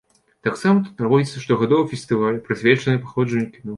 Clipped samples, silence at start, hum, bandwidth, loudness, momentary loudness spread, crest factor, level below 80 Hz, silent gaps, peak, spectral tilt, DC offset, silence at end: under 0.1%; 0.45 s; none; 11.5 kHz; -20 LUFS; 5 LU; 18 dB; -58 dBFS; none; -2 dBFS; -7 dB/octave; under 0.1%; 0 s